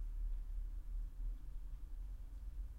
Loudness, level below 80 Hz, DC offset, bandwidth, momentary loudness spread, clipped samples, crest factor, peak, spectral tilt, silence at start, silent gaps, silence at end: -51 LUFS; -44 dBFS; under 0.1%; 2.4 kHz; 6 LU; under 0.1%; 10 dB; -34 dBFS; -7 dB/octave; 0 s; none; 0 s